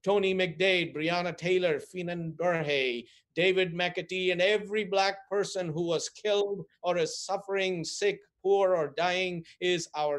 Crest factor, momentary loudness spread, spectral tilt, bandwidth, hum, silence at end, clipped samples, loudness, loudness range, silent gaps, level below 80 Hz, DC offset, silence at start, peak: 16 dB; 8 LU; -4 dB/octave; 11.5 kHz; none; 0 s; under 0.1%; -29 LUFS; 2 LU; none; -72 dBFS; under 0.1%; 0.05 s; -12 dBFS